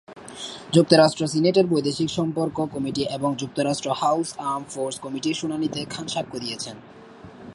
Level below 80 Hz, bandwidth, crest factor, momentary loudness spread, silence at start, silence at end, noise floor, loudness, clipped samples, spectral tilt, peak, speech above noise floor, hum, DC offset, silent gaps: -60 dBFS; 11.5 kHz; 22 dB; 15 LU; 0.1 s; 0 s; -43 dBFS; -23 LUFS; under 0.1%; -5 dB/octave; 0 dBFS; 20 dB; none; under 0.1%; none